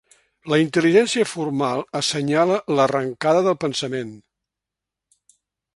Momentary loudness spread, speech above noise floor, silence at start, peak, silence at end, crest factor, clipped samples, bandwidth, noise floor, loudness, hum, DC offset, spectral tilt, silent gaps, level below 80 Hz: 9 LU; 66 dB; 0.45 s; -2 dBFS; 1.55 s; 20 dB; under 0.1%; 11.5 kHz; -86 dBFS; -20 LUFS; none; under 0.1%; -4.5 dB/octave; none; -66 dBFS